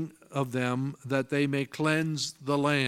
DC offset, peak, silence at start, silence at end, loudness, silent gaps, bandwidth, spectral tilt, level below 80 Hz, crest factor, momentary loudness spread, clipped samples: under 0.1%; -10 dBFS; 0 s; 0 s; -29 LUFS; none; 15.5 kHz; -5.5 dB/octave; -72 dBFS; 18 dB; 6 LU; under 0.1%